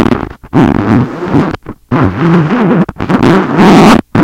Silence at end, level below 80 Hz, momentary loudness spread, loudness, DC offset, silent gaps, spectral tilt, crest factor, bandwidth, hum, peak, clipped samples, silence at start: 0 s; -30 dBFS; 10 LU; -9 LUFS; under 0.1%; none; -7 dB/octave; 8 dB; 16 kHz; none; 0 dBFS; 4%; 0 s